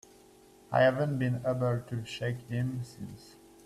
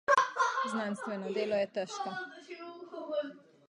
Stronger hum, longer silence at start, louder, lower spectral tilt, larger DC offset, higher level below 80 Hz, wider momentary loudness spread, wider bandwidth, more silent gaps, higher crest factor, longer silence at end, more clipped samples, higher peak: neither; first, 0.7 s vs 0.1 s; about the same, -31 LUFS vs -33 LUFS; first, -7 dB/octave vs -4 dB/octave; neither; first, -62 dBFS vs -82 dBFS; about the same, 18 LU vs 16 LU; first, 13.5 kHz vs 11 kHz; neither; about the same, 20 dB vs 22 dB; about the same, 0.35 s vs 0.3 s; neither; about the same, -12 dBFS vs -12 dBFS